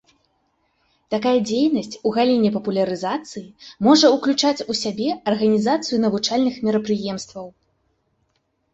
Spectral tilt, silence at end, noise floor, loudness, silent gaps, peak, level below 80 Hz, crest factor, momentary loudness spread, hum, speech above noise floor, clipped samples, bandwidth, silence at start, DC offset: -4.5 dB/octave; 1.25 s; -69 dBFS; -20 LUFS; none; -2 dBFS; -62 dBFS; 18 dB; 13 LU; none; 50 dB; under 0.1%; 8.2 kHz; 1.1 s; under 0.1%